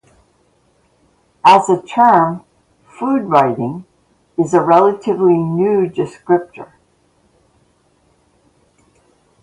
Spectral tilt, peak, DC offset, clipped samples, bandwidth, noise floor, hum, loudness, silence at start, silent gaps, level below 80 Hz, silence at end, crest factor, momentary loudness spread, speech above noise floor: -6.5 dB/octave; 0 dBFS; under 0.1%; under 0.1%; 11 kHz; -57 dBFS; none; -14 LUFS; 1.45 s; none; -58 dBFS; 2.8 s; 16 dB; 14 LU; 44 dB